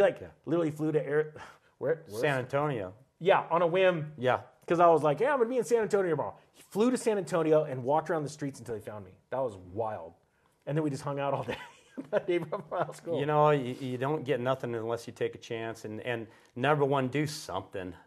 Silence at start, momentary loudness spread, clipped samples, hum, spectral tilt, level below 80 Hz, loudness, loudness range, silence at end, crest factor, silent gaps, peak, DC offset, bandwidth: 0 s; 13 LU; under 0.1%; none; -6 dB/octave; -72 dBFS; -30 LUFS; 8 LU; 0.1 s; 20 dB; none; -10 dBFS; under 0.1%; 13 kHz